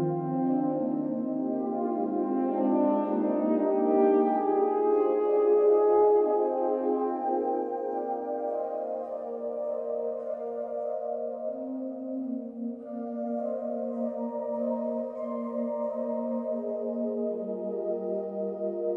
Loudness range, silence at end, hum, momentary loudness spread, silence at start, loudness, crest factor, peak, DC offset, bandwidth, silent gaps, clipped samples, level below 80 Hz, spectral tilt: 10 LU; 0 s; none; 11 LU; 0 s; -29 LUFS; 16 dB; -12 dBFS; under 0.1%; 3.3 kHz; none; under 0.1%; -76 dBFS; -11 dB/octave